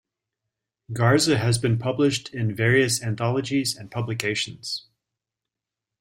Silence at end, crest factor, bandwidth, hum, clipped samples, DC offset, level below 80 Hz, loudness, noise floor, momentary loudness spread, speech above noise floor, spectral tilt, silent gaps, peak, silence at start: 1.2 s; 20 dB; 16 kHz; none; under 0.1%; under 0.1%; -58 dBFS; -23 LUFS; -87 dBFS; 11 LU; 64 dB; -4.5 dB/octave; none; -4 dBFS; 0.9 s